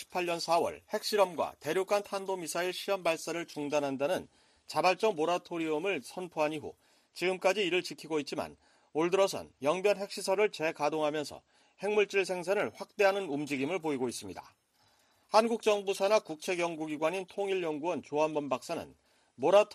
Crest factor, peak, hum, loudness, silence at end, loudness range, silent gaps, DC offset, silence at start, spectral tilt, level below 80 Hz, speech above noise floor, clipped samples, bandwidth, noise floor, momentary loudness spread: 20 dB; -12 dBFS; none; -32 LUFS; 0 s; 2 LU; none; under 0.1%; 0 s; -4 dB/octave; -76 dBFS; 38 dB; under 0.1%; 14.5 kHz; -69 dBFS; 9 LU